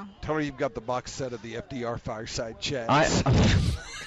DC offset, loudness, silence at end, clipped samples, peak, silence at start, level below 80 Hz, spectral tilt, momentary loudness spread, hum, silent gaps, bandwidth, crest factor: under 0.1%; -27 LUFS; 0 s; under 0.1%; -14 dBFS; 0 s; -38 dBFS; -5 dB/octave; 13 LU; none; none; 12 kHz; 14 dB